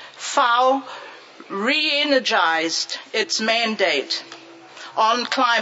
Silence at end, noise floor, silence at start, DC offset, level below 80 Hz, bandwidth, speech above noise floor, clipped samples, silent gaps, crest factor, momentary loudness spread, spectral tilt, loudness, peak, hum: 0 s; -41 dBFS; 0 s; under 0.1%; -84 dBFS; 8 kHz; 21 dB; under 0.1%; none; 18 dB; 15 LU; -1.5 dB/octave; -19 LUFS; -4 dBFS; none